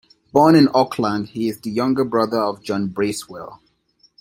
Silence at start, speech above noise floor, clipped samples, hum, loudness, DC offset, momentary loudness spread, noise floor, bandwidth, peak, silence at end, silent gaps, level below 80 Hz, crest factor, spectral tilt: 0.35 s; 41 dB; under 0.1%; none; -18 LUFS; under 0.1%; 14 LU; -59 dBFS; 16.5 kHz; 0 dBFS; 0.65 s; none; -58 dBFS; 18 dB; -6 dB/octave